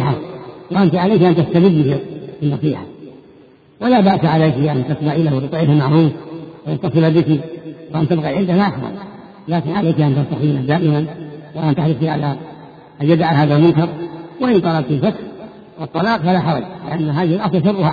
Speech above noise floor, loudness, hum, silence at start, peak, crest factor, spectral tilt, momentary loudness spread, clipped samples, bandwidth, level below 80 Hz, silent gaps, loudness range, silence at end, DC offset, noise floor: 31 dB; -16 LUFS; none; 0 s; 0 dBFS; 16 dB; -10 dB/octave; 17 LU; under 0.1%; 4.9 kHz; -50 dBFS; none; 3 LU; 0 s; under 0.1%; -46 dBFS